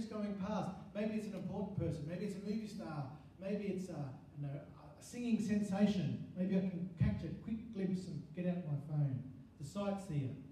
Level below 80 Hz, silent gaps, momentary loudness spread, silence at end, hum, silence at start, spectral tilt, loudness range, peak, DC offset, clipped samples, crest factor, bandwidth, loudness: -62 dBFS; none; 11 LU; 0 s; none; 0 s; -8 dB/octave; 5 LU; -22 dBFS; under 0.1%; under 0.1%; 18 dB; 12 kHz; -41 LUFS